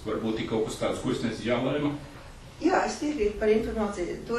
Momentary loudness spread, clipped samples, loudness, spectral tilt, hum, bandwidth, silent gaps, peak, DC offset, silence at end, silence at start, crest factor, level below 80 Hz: 9 LU; under 0.1%; -28 LUFS; -5.5 dB/octave; none; 12.5 kHz; none; -12 dBFS; under 0.1%; 0 s; 0 s; 16 dB; -46 dBFS